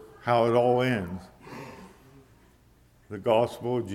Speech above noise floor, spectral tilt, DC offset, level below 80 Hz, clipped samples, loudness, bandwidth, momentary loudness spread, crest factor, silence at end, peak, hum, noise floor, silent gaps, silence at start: 34 dB; -7 dB/octave; under 0.1%; -60 dBFS; under 0.1%; -25 LUFS; 15.5 kHz; 21 LU; 18 dB; 0 s; -10 dBFS; none; -59 dBFS; none; 0 s